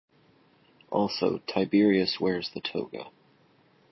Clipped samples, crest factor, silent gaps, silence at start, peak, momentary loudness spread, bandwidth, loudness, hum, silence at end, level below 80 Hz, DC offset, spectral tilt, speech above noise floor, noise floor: under 0.1%; 18 dB; none; 0.9 s; -12 dBFS; 15 LU; 6 kHz; -27 LUFS; none; 0.8 s; -66 dBFS; under 0.1%; -6.5 dB/octave; 36 dB; -62 dBFS